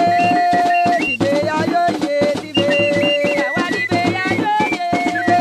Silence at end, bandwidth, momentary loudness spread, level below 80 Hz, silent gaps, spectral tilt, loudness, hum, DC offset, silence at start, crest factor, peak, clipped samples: 0 s; 14 kHz; 4 LU; -52 dBFS; none; -5 dB/octave; -16 LUFS; none; under 0.1%; 0 s; 14 dB; -2 dBFS; under 0.1%